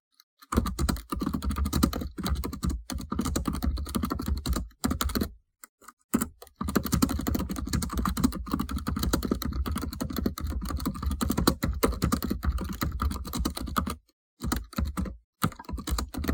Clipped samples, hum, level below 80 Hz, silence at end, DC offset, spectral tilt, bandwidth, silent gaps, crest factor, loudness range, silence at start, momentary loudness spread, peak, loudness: under 0.1%; none; -36 dBFS; 0 s; under 0.1%; -5 dB/octave; 19 kHz; 5.69-5.78 s, 5.93-5.97 s, 6.04-6.09 s, 14.13-14.37 s, 15.24-15.33 s; 24 dB; 3 LU; 0.5 s; 6 LU; -6 dBFS; -31 LUFS